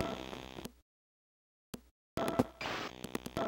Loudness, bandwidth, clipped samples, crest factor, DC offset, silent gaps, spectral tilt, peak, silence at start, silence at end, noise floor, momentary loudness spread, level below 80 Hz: -40 LUFS; 17 kHz; under 0.1%; 28 dB; under 0.1%; 0.82-1.73 s, 1.91-2.17 s; -5 dB/octave; -12 dBFS; 0 s; 0 s; under -90 dBFS; 17 LU; -60 dBFS